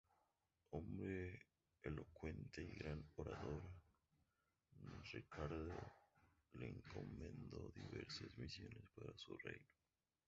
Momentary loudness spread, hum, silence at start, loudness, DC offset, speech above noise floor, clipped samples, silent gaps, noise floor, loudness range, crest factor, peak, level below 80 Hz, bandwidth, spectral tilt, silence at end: 10 LU; none; 0.7 s; -54 LUFS; under 0.1%; 35 dB; under 0.1%; none; -88 dBFS; 3 LU; 20 dB; -34 dBFS; -64 dBFS; 7.6 kHz; -5.5 dB/octave; 0.65 s